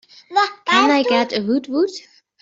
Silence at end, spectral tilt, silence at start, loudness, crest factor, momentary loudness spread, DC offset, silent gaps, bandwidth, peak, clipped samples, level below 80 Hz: 0.45 s; -3.5 dB/octave; 0.3 s; -18 LUFS; 16 dB; 8 LU; under 0.1%; none; 7.8 kHz; -2 dBFS; under 0.1%; -66 dBFS